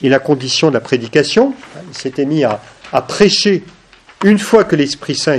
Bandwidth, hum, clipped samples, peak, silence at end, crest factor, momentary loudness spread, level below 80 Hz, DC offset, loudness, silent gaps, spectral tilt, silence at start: 12.5 kHz; none; 0.2%; 0 dBFS; 0 s; 14 dB; 10 LU; -50 dBFS; under 0.1%; -13 LUFS; none; -4.5 dB/octave; 0 s